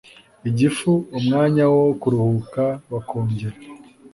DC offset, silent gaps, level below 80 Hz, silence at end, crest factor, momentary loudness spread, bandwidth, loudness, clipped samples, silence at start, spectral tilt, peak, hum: under 0.1%; none; -54 dBFS; 0.05 s; 14 dB; 12 LU; 11.5 kHz; -20 LUFS; under 0.1%; 0.45 s; -7.5 dB/octave; -6 dBFS; none